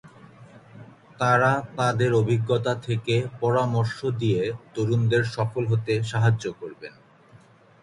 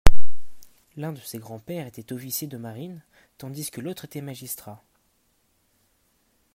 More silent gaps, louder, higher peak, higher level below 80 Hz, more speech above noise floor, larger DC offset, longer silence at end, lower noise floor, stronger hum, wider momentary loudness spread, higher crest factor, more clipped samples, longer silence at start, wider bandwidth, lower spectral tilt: neither; first, -24 LUFS vs -34 LUFS; second, -8 dBFS vs 0 dBFS; second, -58 dBFS vs -32 dBFS; second, 30 dB vs 36 dB; neither; first, 0.9 s vs 0 s; second, -53 dBFS vs -67 dBFS; neither; second, 8 LU vs 16 LU; about the same, 18 dB vs 18 dB; second, under 0.1% vs 0.2%; about the same, 0.05 s vs 0.05 s; second, 11 kHz vs 16 kHz; first, -6.5 dB/octave vs -4.5 dB/octave